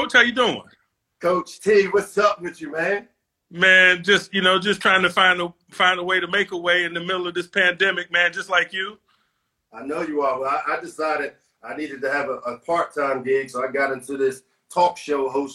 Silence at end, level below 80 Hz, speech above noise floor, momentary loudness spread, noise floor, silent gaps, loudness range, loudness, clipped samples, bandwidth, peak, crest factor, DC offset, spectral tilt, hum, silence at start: 0 s; -64 dBFS; 51 dB; 12 LU; -72 dBFS; none; 8 LU; -20 LUFS; under 0.1%; 12.5 kHz; -2 dBFS; 20 dB; under 0.1%; -3.5 dB/octave; none; 0 s